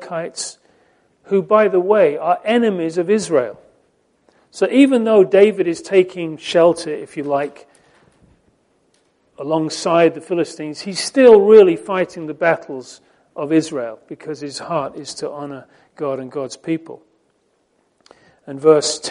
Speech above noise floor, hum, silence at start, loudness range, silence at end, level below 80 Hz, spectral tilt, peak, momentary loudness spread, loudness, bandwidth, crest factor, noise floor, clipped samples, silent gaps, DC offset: 47 dB; none; 0 s; 12 LU; 0 s; -64 dBFS; -5 dB/octave; 0 dBFS; 16 LU; -16 LUFS; 11 kHz; 18 dB; -63 dBFS; under 0.1%; none; under 0.1%